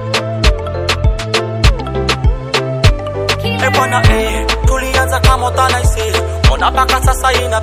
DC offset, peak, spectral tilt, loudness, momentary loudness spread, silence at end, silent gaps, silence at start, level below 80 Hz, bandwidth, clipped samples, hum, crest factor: under 0.1%; 0 dBFS; -4.5 dB/octave; -13 LUFS; 5 LU; 0 s; none; 0 s; -18 dBFS; 15.5 kHz; 0.4%; none; 12 dB